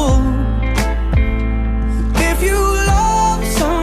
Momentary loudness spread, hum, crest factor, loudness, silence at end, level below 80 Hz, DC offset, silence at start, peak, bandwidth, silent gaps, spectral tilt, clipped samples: 5 LU; none; 10 dB; -16 LUFS; 0 s; -16 dBFS; under 0.1%; 0 s; -4 dBFS; 15 kHz; none; -5.5 dB/octave; under 0.1%